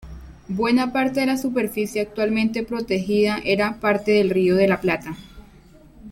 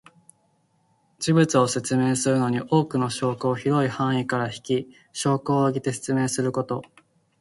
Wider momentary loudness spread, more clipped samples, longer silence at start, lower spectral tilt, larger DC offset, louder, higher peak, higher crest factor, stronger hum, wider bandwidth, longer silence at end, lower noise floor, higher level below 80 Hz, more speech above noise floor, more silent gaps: about the same, 9 LU vs 7 LU; neither; second, 0 s vs 1.2 s; about the same, -6 dB/octave vs -5.5 dB/octave; neither; first, -21 LUFS vs -24 LUFS; about the same, -4 dBFS vs -6 dBFS; about the same, 16 dB vs 18 dB; neither; first, 16.5 kHz vs 11.5 kHz; second, 0 s vs 0.6 s; second, -48 dBFS vs -66 dBFS; first, -48 dBFS vs -62 dBFS; second, 28 dB vs 43 dB; neither